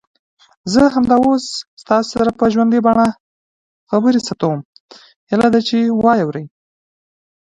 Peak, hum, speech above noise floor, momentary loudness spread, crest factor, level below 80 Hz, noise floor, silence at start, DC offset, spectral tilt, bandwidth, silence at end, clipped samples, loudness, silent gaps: 0 dBFS; none; over 76 dB; 10 LU; 16 dB; -48 dBFS; under -90 dBFS; 0.65 s; under 0.1%; -6 dB/octave; 10.5 kHz; 1.1 s; under 0.1%; -15 LUFS; 1.67-1.77 s, 3.20-3.87 s, 4.65-4.73 s, 4.80-4.89 s, 5.16-5.27 s